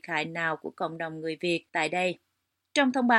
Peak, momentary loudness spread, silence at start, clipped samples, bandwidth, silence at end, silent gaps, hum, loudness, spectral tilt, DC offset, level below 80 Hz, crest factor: -8 dBFS; 8 LU; 0.05 s; under 0.1%; 11 kHz; 0 s; none; none; -29 LUFS; -4.5 dB/octave; under 0.1%; -80 dBFS; 22 dB